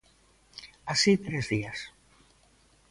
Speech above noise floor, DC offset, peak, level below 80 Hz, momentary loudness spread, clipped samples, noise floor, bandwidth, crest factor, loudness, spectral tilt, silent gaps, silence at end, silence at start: 36 dB; under 0.1%; -10 dBFS; -60 dBFS; 23 LU; under 0.1%; -63 dBFS; 11.5 kHz; 22 dB; -28 LUFS; -4 dB/octave; none; 1 s; 0.55 s